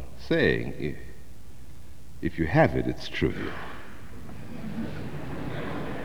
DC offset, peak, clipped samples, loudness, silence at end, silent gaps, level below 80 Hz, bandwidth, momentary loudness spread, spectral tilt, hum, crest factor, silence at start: 2%; -6 dBFS; under 0.1%; -29 LUFS; 0 s; none; -46 dBFS; over 20 kHz; 26 LU; -7 dB/octave; none; 24 dB; 0 s